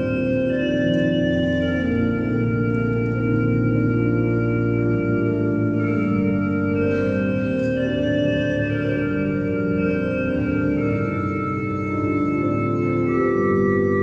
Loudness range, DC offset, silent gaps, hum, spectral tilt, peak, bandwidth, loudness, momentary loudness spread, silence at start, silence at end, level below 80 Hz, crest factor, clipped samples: 2 LU; under 0.1%; none; none; -9 dB/octave; -8 dBFS; 7 kHz; -21 LUFS; 3 LU; 0 s; 0 s; -42 dBFS; 12 dB; under 0.1%